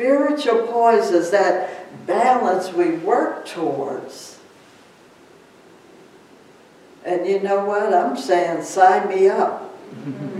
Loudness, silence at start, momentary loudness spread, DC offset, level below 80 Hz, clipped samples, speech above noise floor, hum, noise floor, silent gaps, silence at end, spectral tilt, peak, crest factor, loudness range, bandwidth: -19 LUFS; 0 s; 17 LU; under 0.1%; -76 dBFS; under 0.1%; 30 dB; none; -48 dBFS; none; 0 s; -5 dB/octave; -2 dBFS; 18 dB; 13 LU; 13 kHz